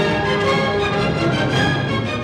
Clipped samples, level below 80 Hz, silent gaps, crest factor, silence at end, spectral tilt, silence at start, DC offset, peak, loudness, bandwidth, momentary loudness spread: under 0.1%; -38 dBFS; none; 12 dB; 0 s; -6 dB/octave; 0 s; under 0.1%; -6 dBFS; -18 LUFS; 12 kHz; 2 LU